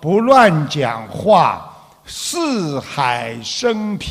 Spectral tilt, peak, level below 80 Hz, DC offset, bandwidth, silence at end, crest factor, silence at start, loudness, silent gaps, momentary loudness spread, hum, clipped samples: -5 dB/octave; 0 dBFS; -52 dBFS; under 0.1%; 15.5 kHz; 0 s; 16 dB; 0 s; -16 LUFS; none; 12 LU; none; under 0.1%